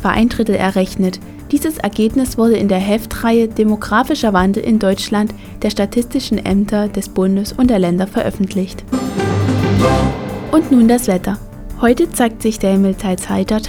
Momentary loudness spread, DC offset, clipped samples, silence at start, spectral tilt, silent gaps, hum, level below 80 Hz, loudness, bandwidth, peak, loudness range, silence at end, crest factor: 7 LU; under 0.1%; under 0.1%; 0 s; -6 dB/octave; none; none; -32 dBFS; -15 LUFS; 18.5 kHz; 0 dBFS; 2 LU; 0 s; 14 dB